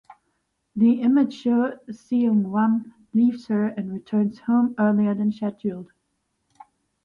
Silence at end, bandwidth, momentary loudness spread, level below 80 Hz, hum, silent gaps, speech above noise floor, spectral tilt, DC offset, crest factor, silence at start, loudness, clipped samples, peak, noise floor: 1.2 s; 6.6 kHz; 10 LU; -68 dBFS; none; none; 52 dB; -9 dB/octave; under 0.1%; 14 dB; 0.75 s; -22 LUFS; under 0.1%; -10 dBFS; -74 dBFS